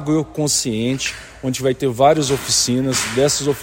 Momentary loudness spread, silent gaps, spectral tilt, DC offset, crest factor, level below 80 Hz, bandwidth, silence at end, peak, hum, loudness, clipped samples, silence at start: 8 LU; none; -3.5 dB/octave; under 0.1%; 16 dB; -46 dBFS; 16.5 kHz; 0 s; -2 dBFS; none; -18 LUFS; under 0.1%; 0 s